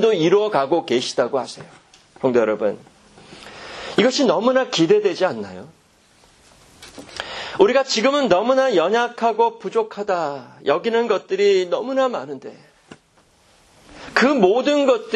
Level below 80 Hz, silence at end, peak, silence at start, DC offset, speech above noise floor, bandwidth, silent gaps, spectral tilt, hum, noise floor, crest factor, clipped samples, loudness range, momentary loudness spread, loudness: -60 dBFS; 0 s; 0 dBFS; 0 s; under 0.1%; 38 dB; 10.5 kHz; none; -4.5 dB/octave; none; -56 dBFS; 20 dB; under 0.1%; 4 LU; 17 LU; -19 LUFS